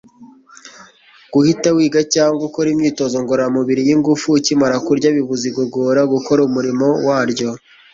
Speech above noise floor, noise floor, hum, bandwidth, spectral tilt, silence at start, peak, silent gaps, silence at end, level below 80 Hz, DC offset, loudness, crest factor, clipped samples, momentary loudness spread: 31 dB; -45 dBFS; none; 7.8 kHz; -5 dB/octave; 0.2 s; -2 dBFS; none; 0.35 s; -56 dBFS; under 0.1%; -15 LUFS; 14 dB; under 0.1%; 6 LU